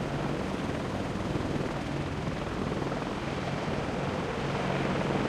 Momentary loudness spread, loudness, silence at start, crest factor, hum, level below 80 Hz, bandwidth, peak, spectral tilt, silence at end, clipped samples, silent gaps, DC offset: 4 LU; -32 LUFS; 0 s; 16 dB; none; -46 dBFS; 13.5 kHz; -16 dBFS; -6.5 dB/octave; 0 s; under 0.1%; none; under 0.1%